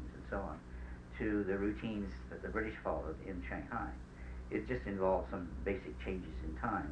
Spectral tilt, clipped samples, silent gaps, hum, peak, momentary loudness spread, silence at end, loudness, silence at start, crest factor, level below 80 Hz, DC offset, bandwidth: -8 dB/octave; under 0.1%; none; none; -20 dBFS; 12 LU; 0 s; -41 LUFS; 0 s; 20 dB; -48 dBFS; under 0.1%; 9.4 kHz